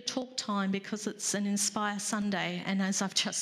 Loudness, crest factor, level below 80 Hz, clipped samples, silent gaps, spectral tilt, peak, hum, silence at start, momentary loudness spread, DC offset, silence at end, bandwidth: -31 LUFS; 20 dB; -78 dBFS; under 0.1%; none; -3 dB/octave; -12 dBFS; none; 0 s; 5 LU; under 0.1%; 0 s; 14.5 kHz